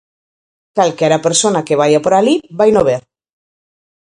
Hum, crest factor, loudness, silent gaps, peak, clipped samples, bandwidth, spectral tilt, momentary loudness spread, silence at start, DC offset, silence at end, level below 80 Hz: none; 14 dB; -13 LUFS; none; 0 dBFS; under 0.1%; 11 kHz; -4 dB/octave; 5 LU; 0.75 s; under 0.1%; 1.05 s; -52 dBFS